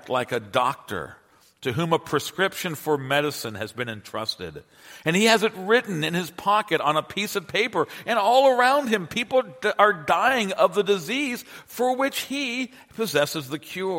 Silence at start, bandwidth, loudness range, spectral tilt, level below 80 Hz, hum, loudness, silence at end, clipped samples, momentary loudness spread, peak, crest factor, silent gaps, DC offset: 0.05 s; 16.5 kHz; 6 LU; -4 dB/octave; -64 dBFS; none; -23 LUFS; 0 s; under 0.1%; 12 LU; -2 dBFS; 22 dB; none; under 0.1%